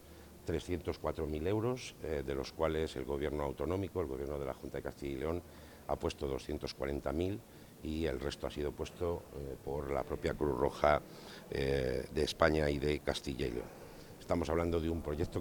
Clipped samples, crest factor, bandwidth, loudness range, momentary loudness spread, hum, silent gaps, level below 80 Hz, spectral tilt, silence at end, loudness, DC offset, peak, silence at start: under 0.1%; 26 dB; 19 kHz; 6 LU; 12 LU; none; none; -50 dBFS; -6 dB/octave; 0 s; -37 LUFS; under 0.1%; -12 dBFS; 0 s